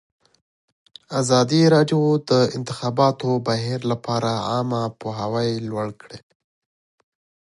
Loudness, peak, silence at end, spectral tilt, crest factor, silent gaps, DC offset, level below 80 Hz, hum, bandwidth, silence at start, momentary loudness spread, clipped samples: -21 LUFS; -4 dBFS; 1.3 s; -6 dB/octave; 18 dB; none; under 0.1%; -60 dBFS; none; 11.5 kHz; 1.1 s; 12 LU; under 0.1%